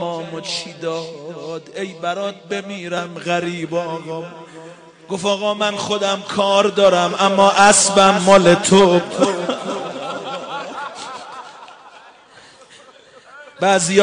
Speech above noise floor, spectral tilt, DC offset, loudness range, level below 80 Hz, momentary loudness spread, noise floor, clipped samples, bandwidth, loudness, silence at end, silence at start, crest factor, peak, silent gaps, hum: 29 dB; -3.5 dB/octave; under 0.1%; 16 LU; -56 dBFS; 19 LU; -45 dBFS; under 0.1%; 10.5 kHz; -16 LUFS; 0 s; 0 s; 18 dB; 0 dBFS; none; none